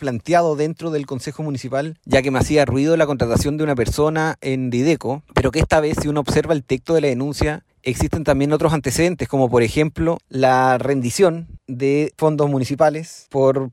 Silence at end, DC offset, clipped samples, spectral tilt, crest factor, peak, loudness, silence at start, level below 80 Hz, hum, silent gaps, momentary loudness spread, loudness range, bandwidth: 0 s; under 0.1%; under 0.1%; -6 dB/octave; 14 dB; -4 dBFS; -19 LUFS; 0 s; -36 dBFS; none; none; 8 LU; 2 LU; 16 kHz